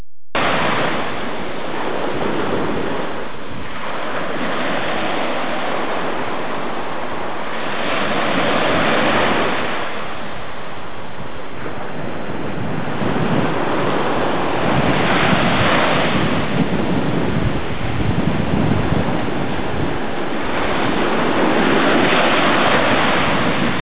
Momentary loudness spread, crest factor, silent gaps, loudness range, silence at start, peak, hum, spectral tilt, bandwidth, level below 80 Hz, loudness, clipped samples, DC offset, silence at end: 12 LU; 14 dB; none; 7 LU; 0.35 s; -4 dBFS; none; -9.5 dB/octave; 4 kHz; -38 dBFS; -19 LUFS; under 0.1%; 9%; 0.1 s